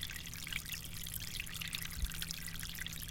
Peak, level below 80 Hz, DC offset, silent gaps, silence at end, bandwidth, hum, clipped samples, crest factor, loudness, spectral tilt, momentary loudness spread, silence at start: -20 dBFS; -48 dBFS; under 0.1%; none; 0 s; 17 kHz; none; under 0.1%; 24 dB; -42 LUFS; -1.5 dB/octave; 2 LU; 0 s